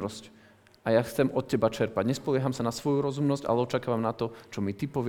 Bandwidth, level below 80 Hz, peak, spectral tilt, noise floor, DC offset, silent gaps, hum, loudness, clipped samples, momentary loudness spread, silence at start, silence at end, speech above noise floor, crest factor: 19 kHz; -60 dBFS; -8 dBFS; -6.5 dB/octave; -56 dBFS; under 0.1%; none; none; -29 LUFS; under 0.1%; 8 LU; 0 s; 0 s; 28 dB; 20 dB